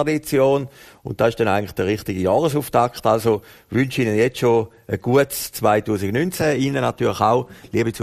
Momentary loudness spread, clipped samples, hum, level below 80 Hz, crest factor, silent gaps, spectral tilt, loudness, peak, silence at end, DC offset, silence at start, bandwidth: 6 LU; under 0.1%; none; -50 dBFS; 18 dB; none; -6 dB/octave; -20 LUFS; -2 dBFS; 0 s; under 0.1%; 0 s; 15.5 kHz